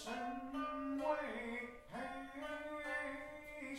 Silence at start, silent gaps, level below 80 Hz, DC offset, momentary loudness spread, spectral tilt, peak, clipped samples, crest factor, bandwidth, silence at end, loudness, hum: 0 s; none; -66 dBFS; under 0.1%; 9 LU; -4 dB/octave; -26 dBFS; under 0.1%; 18 dB; 15.5 kHz; 0 s; -44 LUFS; none